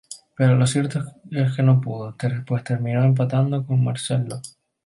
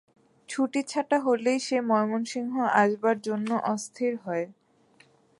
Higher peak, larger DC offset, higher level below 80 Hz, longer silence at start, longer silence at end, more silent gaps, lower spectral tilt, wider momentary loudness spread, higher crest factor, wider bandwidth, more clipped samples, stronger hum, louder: about the same, -6 dBFS vs -8 dBFS; neither; first, -58 dBFS vs -82 dBFS; second, 0.1 s vs 0.5 s; second, 0.35 s vs 0.9 s; neither; first, -7 dB/octave vs -4.5 dB/octave; first, 12 LU vs 8 LU; second, 14 dB vs 20 dB; about the same, 11.5 kHz vs 11.5 kHz; neither; neither; first, -21 LUFS vs -27 LUFS